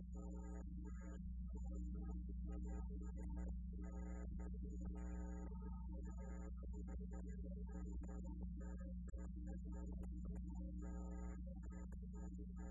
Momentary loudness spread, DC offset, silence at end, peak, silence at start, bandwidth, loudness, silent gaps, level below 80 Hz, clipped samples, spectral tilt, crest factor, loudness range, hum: 3 LU; under 0.1%; 0 s; -38 dBFS; 0 s; 7.4 kHz; -52 LUFS; none; -50 dBFS; under 0.1%; -11.5 dB/octave; 10 dB; 1 LU; none